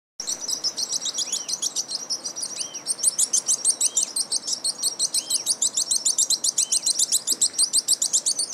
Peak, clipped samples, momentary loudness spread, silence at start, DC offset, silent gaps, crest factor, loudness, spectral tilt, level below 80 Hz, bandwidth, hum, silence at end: -8 dBFS; under 0.1%; 8 LU; 0.2 s; under 0.1%; none; 16 dB; -21 LUFS; 2.5 dB/octave; -80 dBFS; 16 kHz; none; 0 s